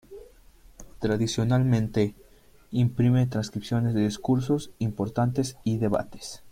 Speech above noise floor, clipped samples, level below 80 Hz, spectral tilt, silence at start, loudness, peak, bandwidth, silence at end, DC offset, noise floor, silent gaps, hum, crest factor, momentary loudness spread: 30 dB; under 0.1%; -50 dBFS; -7 dB/octave; 0.1 s; -26 LUFS; -10 dBFS; 15 kHz; 0 s; under 0.1%; -55 dBFS; none; none; 16 dB; 8 LU